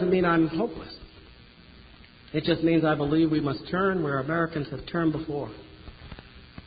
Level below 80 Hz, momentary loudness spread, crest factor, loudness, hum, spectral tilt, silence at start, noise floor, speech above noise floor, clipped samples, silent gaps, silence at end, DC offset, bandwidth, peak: -50 dBFS; 23 LU; 18 dB; -26 LUFS; none; -11 dB/octave; 0 s; -51 dBFS; 25 dB; under 0.1%; none; 0.05 s; under 0.1%; 5 kHz; -10 dBFS